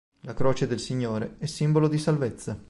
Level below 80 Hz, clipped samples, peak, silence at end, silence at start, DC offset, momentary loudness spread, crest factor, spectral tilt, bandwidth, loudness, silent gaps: -52 dBFS; under 0.1%; -10 dBFS; 0 s; 0.1 s; under 0.1%; 8 LU; 16 dB; -6.5 dB/octave; 11.5 kHz; -27 LUFS; none